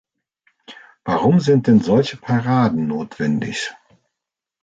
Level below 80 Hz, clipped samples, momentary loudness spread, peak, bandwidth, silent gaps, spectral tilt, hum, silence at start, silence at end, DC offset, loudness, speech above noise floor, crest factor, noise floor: -54 dBFS; under 0.1%; 11 LU; -4 dBFS; 9 kHz; none; -7 dB/octave; none; 0.7 s; 0.9 s; under 0.1%; -18 LUFS; 67 dB; 16 dB; -84 dBFS